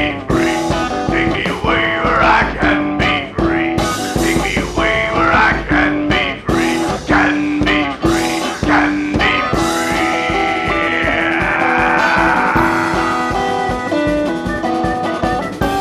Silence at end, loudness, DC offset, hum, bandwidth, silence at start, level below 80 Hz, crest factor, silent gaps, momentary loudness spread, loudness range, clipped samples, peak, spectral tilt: 0 s; -15 LUFS; under 0.1%; none; 15 kHz; 0 s; -30 dBFS; 14 dB; none; 5 LU; 1 LU; under 0.1%; 0 dBFS; -5 dB/octave